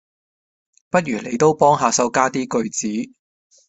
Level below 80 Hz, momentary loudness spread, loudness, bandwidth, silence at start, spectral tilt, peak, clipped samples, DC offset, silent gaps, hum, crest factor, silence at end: -60 dBFS; 10 LU; -19 LUFS; 8.4 kHz; 0.95 s; -4 dB/octave; 0 dBFS; under 0.1%; under 0.1%; none; none; 20 dB; 0.6 s